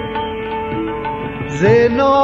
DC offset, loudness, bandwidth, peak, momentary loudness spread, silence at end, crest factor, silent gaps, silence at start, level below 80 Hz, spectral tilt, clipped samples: under 0.1%; -17 LUFS; 7.6 kHz; 0 dBFS; 11 LU; 0 s; 16 dB; none; 0 s; -40 dBFS; -7 dB/octave; under 0.1%